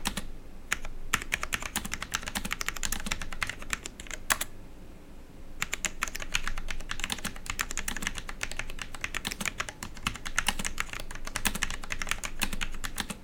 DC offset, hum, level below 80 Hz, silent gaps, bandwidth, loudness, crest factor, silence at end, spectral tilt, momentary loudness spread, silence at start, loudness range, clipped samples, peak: under 0.1%; none; -40 dBFS; none; over 20 kHz; -33 LUFS; 22 dB; 0 s; -1.5 dB/octave; 10 LU; 0 s; 2 LU; under 0.1%; -10 dBFS